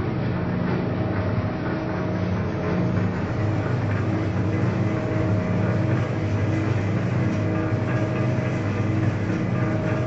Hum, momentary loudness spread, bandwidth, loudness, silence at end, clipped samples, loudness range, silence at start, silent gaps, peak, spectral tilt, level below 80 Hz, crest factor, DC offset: none; 2 LU; 7.6 kHz; -24 LUFS; 0 s; under 0.1%; 1 LU; 0 s; none; -10 dBFS; -8.5 dB/octave; -44 dBFS; 12 dB; under 0.1%